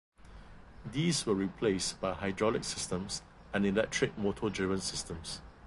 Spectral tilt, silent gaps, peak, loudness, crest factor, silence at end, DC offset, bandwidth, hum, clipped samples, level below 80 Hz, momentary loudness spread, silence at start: -4.5 dB/octave; none; -16 dBFS; -33 LUFS; 18 dB; 0 s; under 0.1%; 11.5 kHz; none; under 0.1%; -54 dBFS; 10 LU; 0.25 s